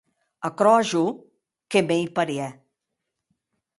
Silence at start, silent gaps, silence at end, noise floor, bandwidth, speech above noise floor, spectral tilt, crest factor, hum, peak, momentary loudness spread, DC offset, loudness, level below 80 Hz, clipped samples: 0.4 s; none; 1.25 s; -82 dBFS; 11.5 kHz; 60 dB; -5 dB/octave; 20 dB; none; -4 dBFS; 14 LU; under 0.1%; -23 LUFS; -70 dBFS; under 0.1%